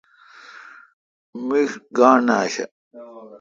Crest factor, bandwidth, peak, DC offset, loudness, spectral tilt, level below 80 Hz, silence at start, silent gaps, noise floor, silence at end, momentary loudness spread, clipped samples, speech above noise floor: 22 dB; 7.6 kHz; 0 dBFS; under 0.1%; -19 LUFS; -4.5 dB/octave; -72 dBFS; 0.55 s; 0.93-1.33 s, 2.71-2.91 s; -47 dBFS; 0.05 s; 26 LU; under 0.1%; 28 dB